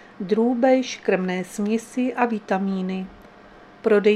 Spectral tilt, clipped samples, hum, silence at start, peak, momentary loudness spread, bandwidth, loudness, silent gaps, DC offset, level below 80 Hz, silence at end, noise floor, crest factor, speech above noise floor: -6 dB/octave; under 0.1%; none; 0.2 s; -4 dBFS; 9 LU; 13 kHz; -23 LUFS; none; under 0.1%; -62 dBFS; 0 s; -47 dBFS; 18 dB; 26 dB